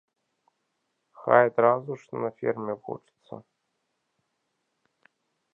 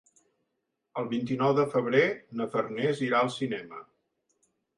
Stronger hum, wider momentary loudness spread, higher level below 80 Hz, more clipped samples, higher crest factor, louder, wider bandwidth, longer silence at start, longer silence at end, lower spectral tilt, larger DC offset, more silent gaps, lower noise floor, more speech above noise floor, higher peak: neither; first, 25 LU vs 12 LU; second, -80 dBFS vs -74 dBFS; neither; first, 28 dB vs 20 dB; first, -25 LUFS vs -28 LUFS; second, 6.8 kHz vs 11 kHz; first, 1.2 s vs 0.95 s; first, 2.15 s vs 0.95 s; first, -8.5 dB/octave vs -6.5 dB/octave; neither; neither; about the same, -78 dBFS vs -81 dBFS; about the same, 53 dB vs 53 dB; first, -2 dBFS vs -10 dBFS